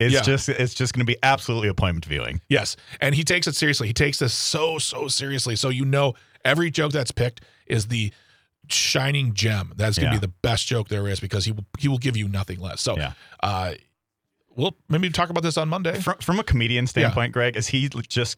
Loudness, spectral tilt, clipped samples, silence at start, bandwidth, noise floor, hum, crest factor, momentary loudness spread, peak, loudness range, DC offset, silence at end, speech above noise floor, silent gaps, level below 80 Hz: -23 LUFS; -4.5 dB/octave; under 0.1%; 0 s; 16 kHz; -78 dBFS; none; 18 dB; 7 LU; -4 dBFS; 4 LU; under 0.1%; 0.05 s; 55 dB; none; -44 dBFS